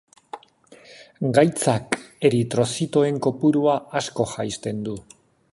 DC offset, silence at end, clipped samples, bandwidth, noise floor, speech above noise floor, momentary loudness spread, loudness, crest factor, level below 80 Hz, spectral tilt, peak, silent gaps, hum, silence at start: under 0.1%; 0.5 s; under 0.1%; 11.5 kHz; -51 dBFS; 30 dB; 16 LU; -22 LUFS; 22 dB; -58 dBFS; -5.5 dB/octave; -2 dBFS; none; none; 0.35 s